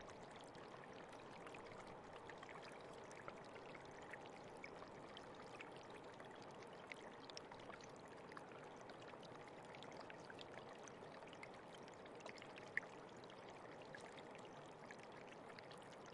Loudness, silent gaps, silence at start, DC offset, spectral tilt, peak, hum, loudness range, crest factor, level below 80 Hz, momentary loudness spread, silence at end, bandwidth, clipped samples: -57 LUFS; none; 0 s; under 0.1%; -4 dB/octave; -26 dBFS; none; 2 LU; 32 dB; -82 dBFS; 2 LU; 0 s; 11 kHz; under 0.1%